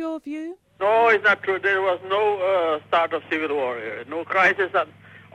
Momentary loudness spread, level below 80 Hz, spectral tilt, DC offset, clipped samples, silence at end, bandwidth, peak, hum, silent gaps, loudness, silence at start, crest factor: 14 LU; -70 dBFS; -4.5 dB/octave; under 0.1%; under 0.1%; 0.15 s; 10 kHz; -8 dBFS; none; none; -21 LUFS; 0 s; 16 dB